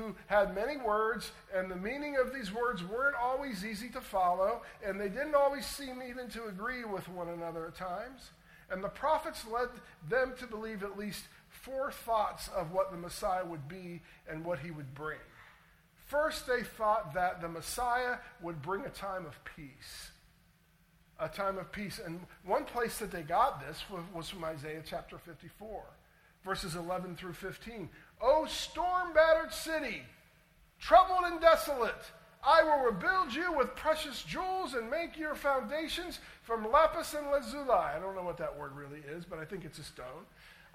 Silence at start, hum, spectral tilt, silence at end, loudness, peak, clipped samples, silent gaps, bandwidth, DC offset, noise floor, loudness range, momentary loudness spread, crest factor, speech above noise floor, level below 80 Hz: 0 s; none; -4 dB/octave; 0.15 s; -34 LUFS; -10 dBFS; under 0.1%; none; 16.5 kHz; under 0.1%; -67 dBFS; 12 LU; 17 LU; 24 dB; 33 dB; -58 dBFS